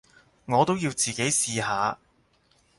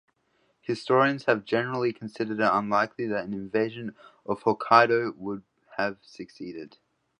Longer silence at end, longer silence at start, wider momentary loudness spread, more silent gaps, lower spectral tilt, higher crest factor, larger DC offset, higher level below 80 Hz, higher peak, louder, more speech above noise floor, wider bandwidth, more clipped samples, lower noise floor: first, 0.85 s vs 0.5 s; second, 0.5 s vs 0.7 s; second, 5 LU vs 20 LU; neither; second, -3 dB/octave vs -6.5 dB/octave; about the same, 20 dB vs 24 dB; neither; first, -62 dBFS vs -70 dBFS; second, -8 dBFS vs -4 dBFS; about the same, -25 LUFS vs -26 LUFS; second, 40 dB vs 44 dB; first, 12 kHz vs 10.5 kHz; neither; second, -65 dBFS vs -70 dBFS